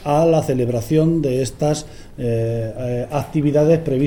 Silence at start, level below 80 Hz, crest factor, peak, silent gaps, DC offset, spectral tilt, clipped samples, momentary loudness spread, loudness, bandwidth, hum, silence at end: 0 s; -40 dBFS; 14 dB; -4 dBFS; none; under 0.1%; -7.5 dB/octave; under 0.1%; 9 LU; -19 LUFS; 18.5 kHz; none; 0 s